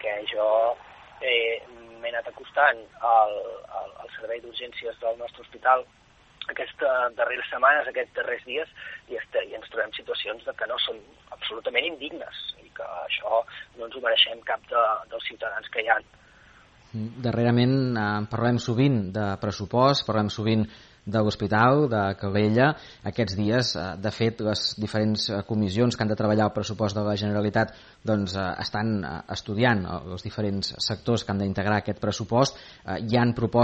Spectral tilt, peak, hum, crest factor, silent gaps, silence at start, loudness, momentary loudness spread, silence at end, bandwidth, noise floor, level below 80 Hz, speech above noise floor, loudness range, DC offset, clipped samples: -5.5 dB/octave; -6 dBFS; none; 20 dB; none; 0 s; -26 LUFS; 14 LU; 0 s; 8.4 kHz; -54 dBFS; -56 dBFS; 28 dB; 6 LU; under 0.1%; under 0.1%